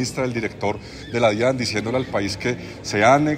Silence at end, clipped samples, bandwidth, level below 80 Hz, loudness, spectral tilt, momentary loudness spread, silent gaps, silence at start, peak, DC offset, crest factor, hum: 0 s; under 0.1%; 16 kHz; -48 dBFS; -22 LUFS; -5 dB/octave; 10 LU; none; 0 s; -4 dBFS; under 0.1%; 18 dB; none